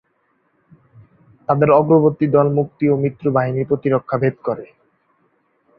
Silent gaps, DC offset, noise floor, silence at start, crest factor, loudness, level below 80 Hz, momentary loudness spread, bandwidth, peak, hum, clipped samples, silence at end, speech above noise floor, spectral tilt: none; under 0.1%; -64 dBFS; 1.5 s; 18 dB; -17 LUFS; -56 dBFS; 11 LU; 4.9 kHz; -2 dBFS; none; under 0.1%; 1.15 s; 48 dB; -12.5 dB/octave